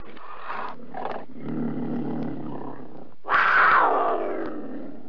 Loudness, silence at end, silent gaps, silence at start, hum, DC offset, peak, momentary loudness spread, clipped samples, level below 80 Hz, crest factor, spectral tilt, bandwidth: -24 LUFS; 0 s; none; 0 s; none; 3%; -8 dBFS; 22 LU; under 0.1%; -60 dBFS; 16 dB; -7 dB/octave; 5.4 kHz